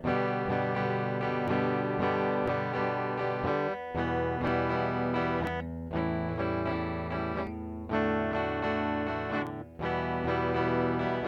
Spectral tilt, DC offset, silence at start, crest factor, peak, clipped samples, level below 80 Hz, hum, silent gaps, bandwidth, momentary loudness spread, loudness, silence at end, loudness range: -8.5 dB/octave; under 0.1%; 0 s; 14 dB; -16 dBFS; under 0.1%; -50 dBFS; none; none; 8 kHz; 5 LU; -31 LUFS; 0 s; 2 LU